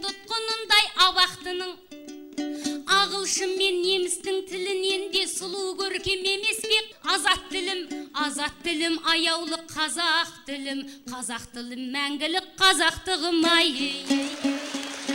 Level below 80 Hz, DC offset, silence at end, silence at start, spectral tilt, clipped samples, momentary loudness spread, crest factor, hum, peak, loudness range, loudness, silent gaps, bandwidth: -58 dBFS; under 0.1%; 0 s; 0 s; -1 dB/octave; under 0.1%; 13 LU; 20 dB; none; -6 dBFS; 3 LU; -24 LUFS; none; 16 kHz